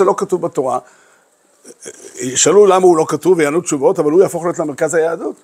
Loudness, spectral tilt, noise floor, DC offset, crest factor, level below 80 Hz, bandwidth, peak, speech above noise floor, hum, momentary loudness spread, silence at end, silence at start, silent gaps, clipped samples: -14 LUFS; -4 dB/octave; -54 dBFS; under 0.1%; 14 dB; -64 dBFS; 15 kHz; 0 dBFS; 40 dB; none; 16 LU; 0.1 s; 0 s; none; under 0.1%